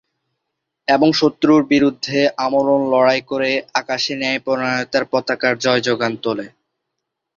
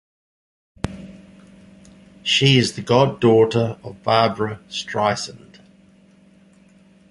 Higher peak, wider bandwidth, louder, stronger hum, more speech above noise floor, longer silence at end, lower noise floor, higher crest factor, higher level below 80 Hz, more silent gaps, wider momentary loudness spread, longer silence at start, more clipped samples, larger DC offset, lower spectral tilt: about the same, -2 dBFS vs -2 dBFS; second, 7.4 kHz vs 11.5 kHz; about the same, -17 LUFS vs -19 LUFS; neither; first, 61 dB vs 34 dB; second, 0.9 s vs 1.75 s; first, -78 dBFS vs -52 dBFS; about the same, 16 dB vs 20 dB; second, -58 dBFS vs -50 dBFS; neither; second, 7 LU vs 16 LU; about the same, 0.9 s vs 0.85 s; neither; neither; about the same, -4.5 dB/octave vs -5 dB/octave